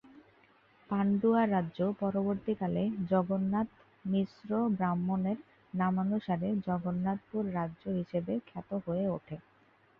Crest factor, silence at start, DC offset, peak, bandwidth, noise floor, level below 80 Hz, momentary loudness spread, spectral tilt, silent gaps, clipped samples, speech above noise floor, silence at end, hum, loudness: 16 dB; 0.05 s; under 0.1%; -18 dBFS; 4.9 kHz; -64 dBFS; -66 dBFS; 9 LU; -11 dB/octave; none; under 0.1%; 33 dB; 0.6 s; none; -33 LUFS